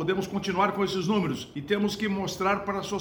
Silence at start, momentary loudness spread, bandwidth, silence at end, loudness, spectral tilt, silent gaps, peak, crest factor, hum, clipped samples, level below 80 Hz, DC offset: 0 s; 5 LU; over 20 kHz; 0 s; -28 LUFS; -5.5 dB/octave; none; -12 dBFS; 16 dB; none; under 0.1%; -56 dBFS; under 0.1%